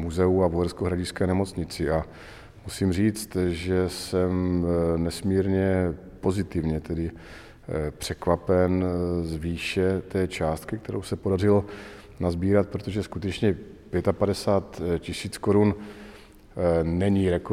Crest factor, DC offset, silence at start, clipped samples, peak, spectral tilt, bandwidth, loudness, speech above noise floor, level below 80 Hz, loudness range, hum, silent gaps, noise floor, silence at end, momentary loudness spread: 18 dB; under 0.1%; 0 s; under 0.1%; -8 dBFS; -7 dB/octave; 15.5 kHz; -26 LUFS; 23 dB; -44 dBFS; 2 LU; none; none; -48 dBFS; 0 s; 12 LU